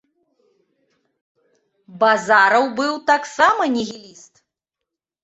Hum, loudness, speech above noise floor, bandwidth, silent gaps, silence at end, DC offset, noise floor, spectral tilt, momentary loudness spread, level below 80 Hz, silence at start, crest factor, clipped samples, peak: none; -17 LUFS; 66 dB; 8.2 kHz; none; 1.25 s; under 0.1%; -84 dBFS; -3 dB/octave; 10 LU; -66 dBFS; 1.9 s; 20 dB; under 0.1%; -2 dBFS